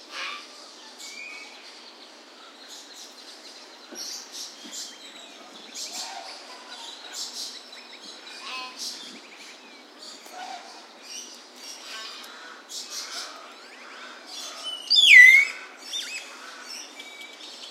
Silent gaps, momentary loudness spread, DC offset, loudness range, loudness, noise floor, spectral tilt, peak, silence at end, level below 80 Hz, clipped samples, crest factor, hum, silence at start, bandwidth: none; 15 LU; under 0.1%; 22 LU; -18 LUFS; -48 dBFS; 3 dB/octave; -2 dBFS; 0 s; under -90 dBFS; under 0.1%; 26 dB; none; 0.1 s; 16 kHz